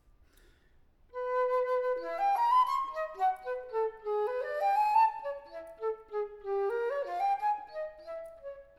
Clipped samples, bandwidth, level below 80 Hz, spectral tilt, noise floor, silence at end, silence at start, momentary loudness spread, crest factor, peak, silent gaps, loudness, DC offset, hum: under 0.1%; 13.5 kHz; -66 dBFS; -3.5 dB/octave; -64 dBFS; 0.15 s; 1.15 s; 16 LU; 16 dB; -16 dBFS; none; -31 LUFS; under 0.1%; none